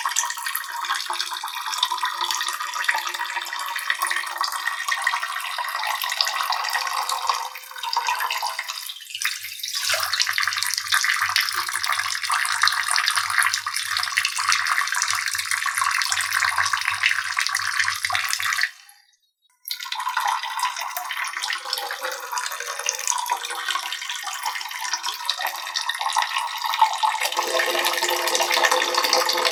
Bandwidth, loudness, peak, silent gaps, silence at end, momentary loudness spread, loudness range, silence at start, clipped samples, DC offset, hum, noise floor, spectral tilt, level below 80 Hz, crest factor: over 20 kHz; -23 LUFS; -2 dBFS; none; 0 s; 8 LU; 5 LU; 0 s; under 0.1%; under 0.1%; none; -66 dBFS; 2 dB/octave; -76 dBFS; 24 dB